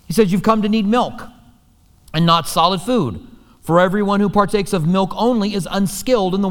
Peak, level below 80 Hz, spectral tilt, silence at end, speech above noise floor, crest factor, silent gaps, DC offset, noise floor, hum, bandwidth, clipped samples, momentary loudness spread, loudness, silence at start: 0 dBFS; -42 dBFS; -5.5 dB/octave; 0 s; 36 dB; 16 dB; none; under 0.1%; -52 dBFS; none; 18.5 kHz; under 0.1%; 8 LU; -17 LUFS; 0.1 s